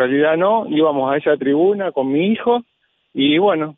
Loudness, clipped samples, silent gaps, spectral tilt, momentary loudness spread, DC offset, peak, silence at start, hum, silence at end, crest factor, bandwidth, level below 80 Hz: -17 LUFS; under 0.1%; none; -9 dB/octave; 5 LU; under 0.1%; -4 dBFS; 0 s; none; 0.05 s; 12 dB; 3.9 kHz; -64 dBFS